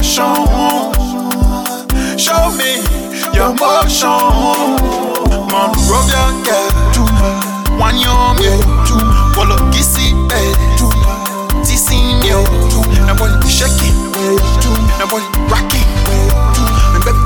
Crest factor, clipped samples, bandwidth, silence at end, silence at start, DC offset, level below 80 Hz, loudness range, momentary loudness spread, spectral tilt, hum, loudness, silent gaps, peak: 10 dB; under 0.1%; 19.5 kHz; 0 s; 0 s; under 0.1%; -14 dBFS; 1 LU; 5 LU; -4 dB/octave; none; -12 LUFS; none; 0 dBFS